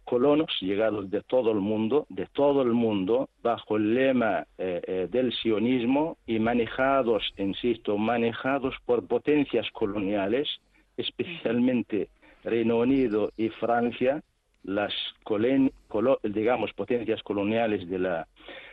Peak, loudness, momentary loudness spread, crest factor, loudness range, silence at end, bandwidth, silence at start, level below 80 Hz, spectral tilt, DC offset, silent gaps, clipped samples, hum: -12 dBFS; -27 LUFS; 8 LU; 14 dB; 2 LU; 0 s; 5 kHz; 0.05 s; -58 dBFS; -8.5 dB/octave; under 0.1%; none; under 0.1%; none